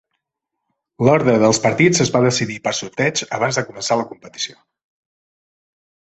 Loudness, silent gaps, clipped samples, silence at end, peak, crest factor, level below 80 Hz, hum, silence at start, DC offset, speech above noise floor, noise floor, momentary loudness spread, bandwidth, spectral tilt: -17 LUFS; none; under 0.1%; 1.6 s; 0 dBFS; 18 dB; -56 dBFS; none; 1 s; under 0.1%; 62 dB; -80 dBFS; 13 LU; 8.4 kHz; -4.5 dB/octave